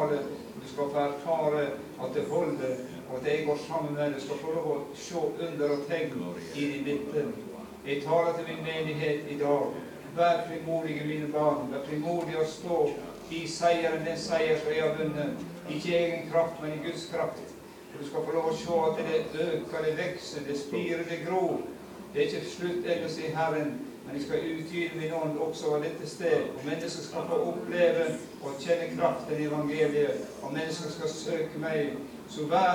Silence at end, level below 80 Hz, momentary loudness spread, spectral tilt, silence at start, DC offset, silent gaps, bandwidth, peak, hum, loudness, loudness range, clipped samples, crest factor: 0 s; -66 dBFS; 10 LU; -5.5 dB/octave; 0 s; under 0.1%; none; 19 kHz; -12 dBFS; none; -31 LUFS; 3 LU; under 0.1%; 18 dB